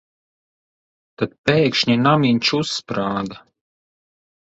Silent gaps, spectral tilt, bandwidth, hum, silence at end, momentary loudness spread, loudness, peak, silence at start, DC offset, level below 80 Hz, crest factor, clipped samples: 1.38-1.44 s; -5.5 dB/octave; 8 kHz; none; 1.05 s; 11 LU; -18 LUFS; -2 dBFS; 1.2 s; under 0.1%; -56 dBFS; 20 dB; under 0.1%